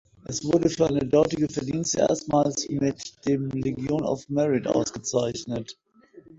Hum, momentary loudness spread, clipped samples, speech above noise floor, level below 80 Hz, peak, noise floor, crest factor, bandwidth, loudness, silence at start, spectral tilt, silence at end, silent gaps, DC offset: none; 10 LU; under 0.1%; 27 dB; -54 dBFS; -8 dBFS; -51 dBFS; 18 dB; 8 kHz; -25 LUFS; 0.3 s; -5.5 dB/octave; 0.05 s; none; under 0.1%